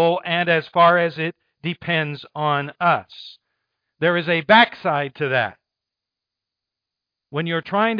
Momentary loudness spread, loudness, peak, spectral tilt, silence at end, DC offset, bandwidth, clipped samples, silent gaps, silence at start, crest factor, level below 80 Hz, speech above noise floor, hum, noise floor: 13 LU; -20 LUFS; -2 dBFS; -7.5 dB/octave; 0 s; under 0.1%; 5.2 kHz; under 0.1%; none; 0 s; 20 dB; -68 dBFS; 66 dB; none; -85 dBFS